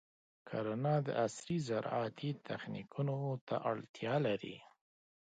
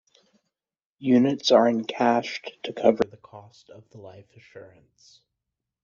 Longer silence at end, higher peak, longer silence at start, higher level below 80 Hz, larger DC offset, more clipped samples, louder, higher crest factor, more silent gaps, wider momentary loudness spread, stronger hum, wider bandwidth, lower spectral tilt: second, 0.6 s vs 1.2 s; second, -22 dBFS vs -4 dBFS; second, 0.45 s vs 1 s; second, -78 dBFS vs -68 dBFS; neither; neither; second, -38 LUFS vs -23 LUFS; about the same, 18 dB vs 22 dB; first, 3.41-3.47 s, 3.89-3.94 s vs none; second, 9 LU vs 14 LU; neither; first, 9 kHz vs 7.2 kHz; first, -6.5 dB/octave vs -4 dB/octave